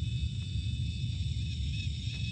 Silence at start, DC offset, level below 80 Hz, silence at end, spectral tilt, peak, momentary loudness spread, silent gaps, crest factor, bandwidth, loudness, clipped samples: 0 s; under 0.1%; -38 dBFS; 0 s; -5 dB/octave; -22 dBFS; 1 LU; none; 10 dB; 9 kHz; -35 LUFS; under 0.1%